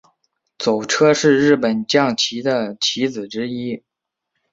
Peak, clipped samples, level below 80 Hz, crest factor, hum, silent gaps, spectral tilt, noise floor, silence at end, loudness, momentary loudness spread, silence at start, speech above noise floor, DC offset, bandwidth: -2 dBFS; under 0.1%; -60 dBFS; 18 dB; none; none; -4 dB/octave; -77 dBFS; 0.75 s; -18 LUFS; 12 LU; 0.6 s; 60 dB; under 0.1%; 8 kHz